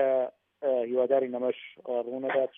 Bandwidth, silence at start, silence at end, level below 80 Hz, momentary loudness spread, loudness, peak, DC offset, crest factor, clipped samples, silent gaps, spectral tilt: 3.7 kHz; 0 s; 0.1 s; under -90 dBFS; 8 LU; -30 LUFS; -14 dBFS; under 0.1%; 16 dB; under 0.1%; none; -3.5 dB/octave